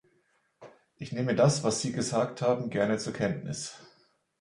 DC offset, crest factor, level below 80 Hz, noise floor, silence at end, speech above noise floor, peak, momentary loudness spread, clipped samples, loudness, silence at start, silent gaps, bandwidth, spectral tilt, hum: under 0.1%; 20 dB; -64 dBFS; -71 dBFS; 0.55 s; 42 dB; -10 dBFS; 13 LU; under 0.1%; -29 LUFS; 0.6 s; none; 11.5 kHz; -5 dB/octave; none